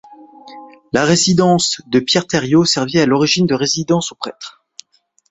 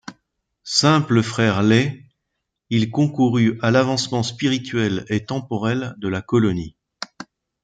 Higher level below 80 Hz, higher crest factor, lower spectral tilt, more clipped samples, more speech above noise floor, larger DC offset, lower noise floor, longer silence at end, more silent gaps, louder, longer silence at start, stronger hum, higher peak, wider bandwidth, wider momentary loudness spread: about the same, -52 dBFS vs -56 dBFS; about the same, 16 dB vs 18 dB; second, -4 dB/octave vs -5.5 dB/octave; neither; second, 44 dB vs 59 dB; neither; second, -59 dBFS vs -78 dBFS; first, 0.8 s vs 0.4 s; neither; first, -14 LUFS vs -20 LUFS; first, 0.2 s vs 0.05 s; neither; about the same, -2 dBFS vs -4 dBFS; second, 8.2 kHz vs 9.2 kHz; second, 13 LU vs 18 LU